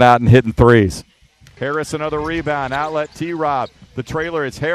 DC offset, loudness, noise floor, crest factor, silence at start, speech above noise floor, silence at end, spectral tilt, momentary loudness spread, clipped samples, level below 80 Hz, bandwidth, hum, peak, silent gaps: under 0.1%; -17 LUFS; -48 dBFS; 16 dB; 0 s; 32 dB; 0 s; -7 dB/octave; 14 LU; under 0.1%; -36 dBFS; 13 kHz; none; 0 dBFS; none